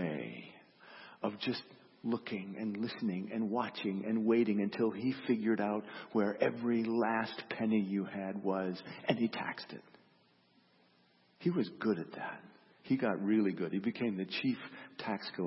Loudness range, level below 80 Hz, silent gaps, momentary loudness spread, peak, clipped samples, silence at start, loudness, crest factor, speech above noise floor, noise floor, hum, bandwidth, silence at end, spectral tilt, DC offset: 6 LU; -82 dBFS; none; 12 LU; -16 dBFS; under 0.1%; 0 s; -36 LUFS; 20 dB; 34 dB; -69 dBFS; none; 5.8 kHz; 0 s; -5 dB/octave; under 0.1%